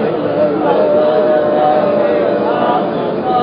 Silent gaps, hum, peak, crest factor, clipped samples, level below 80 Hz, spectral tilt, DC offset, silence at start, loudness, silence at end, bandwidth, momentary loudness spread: none; none; 0 dBFS; 12 dB; under 0.1%; -50 dBFS; -12 dB/octave; under 0.1%; 0 s; -13 LUFS; 0 s; 5.2 kHz; 4 LU